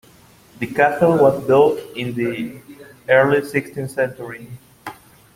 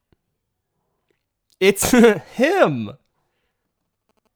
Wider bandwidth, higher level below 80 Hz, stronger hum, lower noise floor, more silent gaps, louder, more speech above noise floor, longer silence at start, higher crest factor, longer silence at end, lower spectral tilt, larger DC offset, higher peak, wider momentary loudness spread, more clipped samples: second, 16.5 kHz vs over 20 kHz; second, -56 dBFS vs -50 dBFS; neither; second, -49 dBFS vs -76 dBFS; neither; about the same, -18 LUFS vs -17 LUFS; second, 31 dB vs 60 dB; second, 0.6 s vs 1.6 s; about the same, 18 dB vs 20 dB; second, 0.45 s vs 1.45 s; first, -6.5 dB/octave vs -4.5 dB/octave; neither; about the same, 0 dBFS vs 0 dBFS; first, 22 LU vs 11 LU; neither